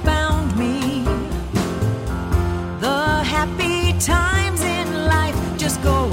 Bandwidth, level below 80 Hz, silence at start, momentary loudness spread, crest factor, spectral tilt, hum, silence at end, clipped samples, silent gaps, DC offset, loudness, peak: 17 kHz; -28 dBFS; 0 s; 5 LU; 16 dB; -5 dB/octave; none; 0 s; under 0.1%; none; under 0.1%; -20 LUFS; -4 dBFS